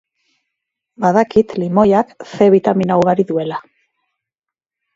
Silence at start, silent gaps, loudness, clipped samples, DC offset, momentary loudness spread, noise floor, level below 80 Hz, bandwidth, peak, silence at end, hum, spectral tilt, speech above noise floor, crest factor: 1 s; none; -15 LUFS; under 0.1%; under 0.1%; 9 LU; -85 dBFS; -54 dBFS; 7.6 kHz; 0 dBFS; 1.35 s; none; -8 dB/octave; 72 dB; 16 dB